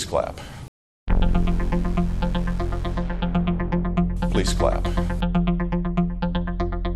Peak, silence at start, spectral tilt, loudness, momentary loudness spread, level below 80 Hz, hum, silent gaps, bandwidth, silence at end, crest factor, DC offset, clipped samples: -6 dBFS; 0 s; -6.5 dB/octave; -24 LUFS; 5 LU; -26 dBFS; none; 0.68-1.07 s; 12 kHz; 0 s; 16 dB; under 0.1%; under 0.1%